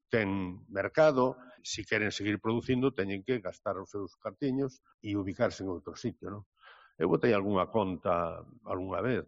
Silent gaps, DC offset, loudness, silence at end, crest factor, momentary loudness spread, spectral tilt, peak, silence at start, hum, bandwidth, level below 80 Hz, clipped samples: 4.94-4.98 s, 6.46-6.52 s; under 0.1%; -32 LUFS; 0.05 s; 20 dB; 13 LU; -5 dB/octave; -12 dBFS; 0.1 s; none; 7.6 kHz; -62 dBFS; under 0.1%